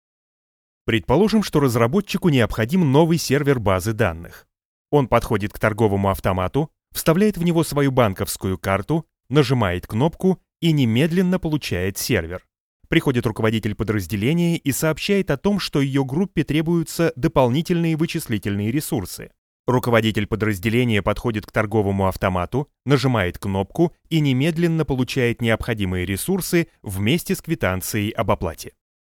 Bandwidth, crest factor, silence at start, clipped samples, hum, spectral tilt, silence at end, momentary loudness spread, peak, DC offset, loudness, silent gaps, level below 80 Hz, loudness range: 19 kHz; 20 dB; 0.85 s; under 0.1%; none; -6 dB/octave; 0.5 s; 6 LU; 0 dBFS; under 0.1%; -21 LUFS; 4.65-4.85 s, 12.60-12.80 s, 19.38-19.64 s; -42 dBFS; 3 LU